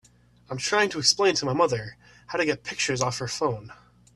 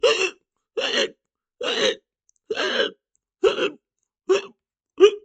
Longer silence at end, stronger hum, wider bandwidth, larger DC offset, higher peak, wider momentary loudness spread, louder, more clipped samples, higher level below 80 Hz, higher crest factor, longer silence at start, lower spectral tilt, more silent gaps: first, 0.4 s vs 0.05 s; first, 60 Hz at -50 dBFS vs none; first, 12.5 kHz vs 9 kHz; neither; second, -4 dBFS vs 0 dBFS; about the same, 12 LU vs 13 LU; about the same, -24 LUFS vs -23 LUFS; neither; about the same, -60 dBFS vs -64 dBFS; about the same, 22 dB vs 24 dB; first, 0.5 s vs 0.05 s; first, -3 dB/octave vs -1.5 dB/octave; neither